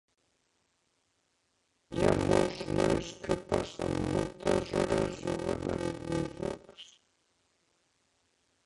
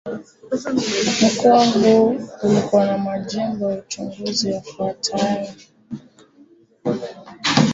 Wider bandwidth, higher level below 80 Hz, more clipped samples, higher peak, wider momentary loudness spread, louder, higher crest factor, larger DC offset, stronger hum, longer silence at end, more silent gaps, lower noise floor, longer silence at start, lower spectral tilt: first, 11.5 kHz vs 8 kHz; first, -50 dBFS vs -58 dBFS; neither; second, -10 dBFS vs -2 dBFS; second, 10 LU vs 19 LU; second, -32 LUFS vs -19 LUFS; first, 24 dB vs 18 dB; neither; neither; first, 1.8 s vs 0 s; neither; first, -76 dBFS vs -51 dBFS; first, 1.9 s vs 0.05 s; first, -6 dB/octave vs -4.5 dB/octave